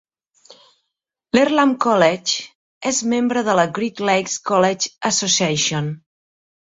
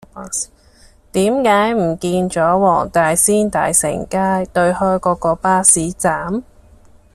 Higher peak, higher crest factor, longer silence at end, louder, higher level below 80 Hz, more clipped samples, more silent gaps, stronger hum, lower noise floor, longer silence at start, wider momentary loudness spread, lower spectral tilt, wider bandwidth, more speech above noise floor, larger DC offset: about the same, 0 dBFS vs 0 dBFS; about the same, 20 dB vs 16 dB; about the same, 0.65 s vs 0.75 s; second, -18 LUFS vs -15 LUFS; second, -60 dBFS vs -44 dBFS; neither; first, 2.55-2.81 s vs none; neither; first, -79 dBFS vs -45 dBFS; first, 0.5 s vs 0.15 s; about the same, 9 LU vs 11 LU; about the same, -3.5 dB/octave vs -4 dB/octave; second, 8 kHz vs 15.5 kHz; first, 61 dB vs 30 dB; neither